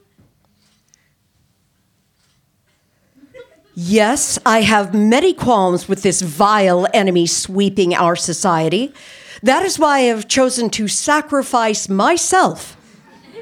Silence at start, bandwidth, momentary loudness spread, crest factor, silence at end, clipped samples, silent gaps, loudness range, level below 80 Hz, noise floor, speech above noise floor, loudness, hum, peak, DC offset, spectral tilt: 3.35 s; 17 kHz; 6 LU; 14 dB; 0 s; under 0.1%; none; 4 LU; -52 dBFS; -62 dBFS; 47 dB; -15 LUFS; none; -2 dBFS; under 0.1%; -3.5 dB/octave